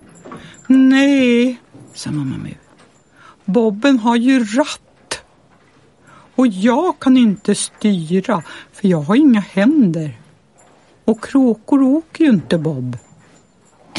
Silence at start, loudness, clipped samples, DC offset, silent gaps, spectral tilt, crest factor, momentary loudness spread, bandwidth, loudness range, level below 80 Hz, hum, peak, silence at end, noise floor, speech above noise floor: 0.25 s; -15 LUFS; under 0.1%; under 0.1%; none; -6 dB/octave; 14 dB; 17 LU; 11.5 kHz; 3 LU; -58 dBFS; none; -2 dBFS; 0 s; -51 dBFS; 37 dB